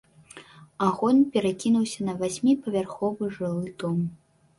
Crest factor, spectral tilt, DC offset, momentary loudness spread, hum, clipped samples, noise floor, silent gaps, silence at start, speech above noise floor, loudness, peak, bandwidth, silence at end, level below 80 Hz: 18 dB; -6.5 dB/octave; under 0.1%; 9 LU; none; under 0.1%; -49 dBFS; none; 0.35 s; 25 dB; -26 LUFS; -8 dBFS; 11.5 kHz; 0.45 s; -64 dBFS